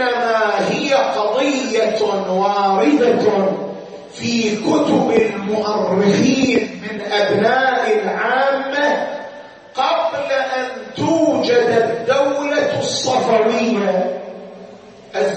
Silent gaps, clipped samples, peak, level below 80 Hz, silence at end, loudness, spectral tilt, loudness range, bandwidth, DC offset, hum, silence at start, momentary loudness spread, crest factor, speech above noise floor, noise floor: none; under 0.1%; -2 dBFS; -60 dBFS; 0 s; -17 LUFS; -4.5 dB/octave; 2 LU; 8.6 kHz; under 0.1%; none; 0 s; 11 LU; 14 dB; 23 dB; -39 dBFS